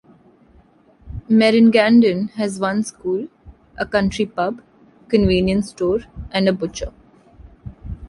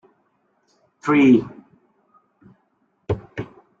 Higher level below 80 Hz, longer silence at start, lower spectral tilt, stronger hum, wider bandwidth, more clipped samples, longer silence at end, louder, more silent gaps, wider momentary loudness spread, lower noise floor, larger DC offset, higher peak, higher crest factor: first, -40 dBFS vs -54 dBFS; about the same, 1.05 s vs 1.05 s; second, -6 dB/octave vs -7.5 dB/octave; neither; first, 11.5 kHz vs 7.4 kHz; neither; second, 0 s vs 0.35 s; about the same, -18 LUFS vs -19 LUFS; neither; about the same, 23 LU vs 24 LU; second, -52 dBFS vs -67 dBFS; neither; about the same, -2 dBFS vs -4 dBFS; about the same, 18 dB vs 20 dB